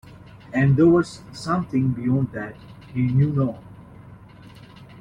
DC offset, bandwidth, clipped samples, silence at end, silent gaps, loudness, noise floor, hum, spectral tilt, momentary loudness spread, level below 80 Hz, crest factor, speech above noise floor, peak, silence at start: under 0.1%; 10 kHz; under 0.1%; 0 s; none; -21 LUFS; -45 dBFS; none; -8.5 dB/octave; 17 LU; -50 dBFS; 16 dB; 24 dB; -6 dBFS; 0.05 s